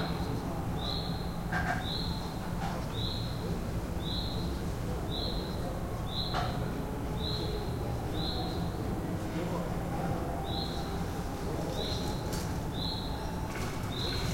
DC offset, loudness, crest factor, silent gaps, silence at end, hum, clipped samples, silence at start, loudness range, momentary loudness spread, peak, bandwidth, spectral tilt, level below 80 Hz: under 0.1%; -35 LUFS; 14 dB; none; 0 s; none; under 0.1%; 0 s; 1 LU; 3 LU; -20 dBFS; 16.5 kHz; -5.5 dB/octave; -40 dBFS